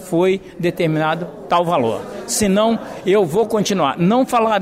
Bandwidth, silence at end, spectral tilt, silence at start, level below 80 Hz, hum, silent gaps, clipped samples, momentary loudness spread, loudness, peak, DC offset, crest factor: 16 kHz; 0 s; -5 dB/octave; 0 s; -50 dBFS; none; none; under 0.1%; 6 LU; -18 LUFS; -6 dBFS; under 0.1%; 12 dB